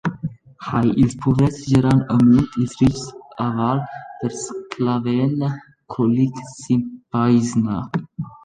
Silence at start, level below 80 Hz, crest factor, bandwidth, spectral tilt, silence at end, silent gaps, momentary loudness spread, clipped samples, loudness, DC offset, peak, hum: 0.05 s; -44 dBFS; 16 dB; 10 kHz; -7.5 dB/octave; 0.1 s; none; 15 LU; under 0.1%; -19 LUFS; under 0.1%; -4 dBFS; none